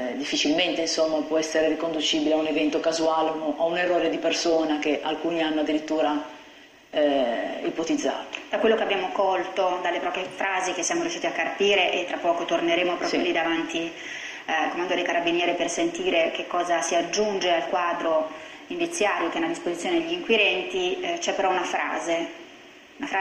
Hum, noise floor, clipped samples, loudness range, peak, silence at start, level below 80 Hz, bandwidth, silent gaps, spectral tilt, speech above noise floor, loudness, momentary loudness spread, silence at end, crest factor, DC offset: none; -50 dBFS; under 0.1%; 2 LU; -8 dBFS; 0 s; -62 dBFS; 12 kHz; none; -2.5 dB/octave; 25 dB; -24 LUFS; 7 LU; 0 s; 18 dB; under 0.1%